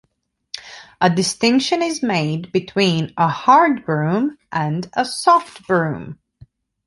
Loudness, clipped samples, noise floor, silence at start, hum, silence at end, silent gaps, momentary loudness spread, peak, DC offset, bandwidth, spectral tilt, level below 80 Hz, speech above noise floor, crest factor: -18 LUFS; under 0.1%; -64 dBFS; 0.55 s; none; 0.7 s; none; 18 LU; -2 dBFS; under 0.1%; 11.5 kHz; -5 dB/octave; -58 dBFS; 46 dB; 18 dB